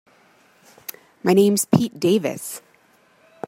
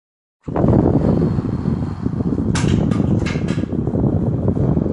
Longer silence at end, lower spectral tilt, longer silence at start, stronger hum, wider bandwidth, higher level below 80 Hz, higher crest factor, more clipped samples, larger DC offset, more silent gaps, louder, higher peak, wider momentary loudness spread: first, 0.9 s vs 0 s; second, -5.5 dB/octave vs -8 dB/octave; first, 1.25 s vs 0.45 s; neither; first, 16 kHz vs 11.5 kHz; second, -62 dBFS vs -30 dBFS; about the same, 20 dB vs 16 dB; neither; neither; neither; about the same, -19 LUFS vs -18 LUFS; about the same, -2 dBFS vs -2 dBFS; first, 20 LU vs 7 LU